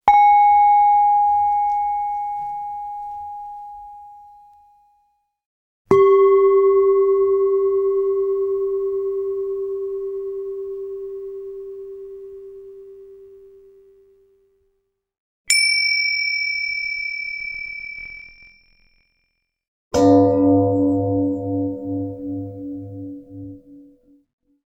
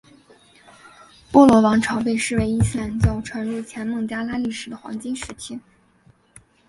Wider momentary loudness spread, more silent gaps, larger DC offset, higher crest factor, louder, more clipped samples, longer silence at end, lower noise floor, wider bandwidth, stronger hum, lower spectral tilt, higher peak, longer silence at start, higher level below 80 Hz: first, 22 LU vs 19 LU; first, 5.46-5.85 s, 15.18-15.45 s, 19.68-19.91 s vs none; neither; about the same, 20 dB vs 22 dB; about the same, -18 LUFS vs -20 LUFS; neither; about the same, 1 s vs 1.1 s; first, -72 dBFS vs -56 dBFS; first, 16 kHz vs 11.5 kHz; neither; second, -4.5 dB/octave vs -6 dB/octave; about the same, 0 dBFS vs 0 dBFS; second, 0.05 s vs 1.3 s; second, -54 dBFS vs -38 dBFS